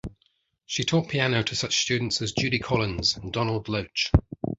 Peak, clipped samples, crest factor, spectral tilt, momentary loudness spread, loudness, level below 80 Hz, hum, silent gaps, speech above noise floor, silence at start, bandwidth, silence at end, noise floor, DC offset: -2 dBFS; under 0.1%; 24 dB; -4 dB/octave; 5 LU; -25 LUFS; -38 dBFS; none; none; 44 dB; 0.05 s; 8 kHz; 0.05 s; -70 dBFS; under 0.1%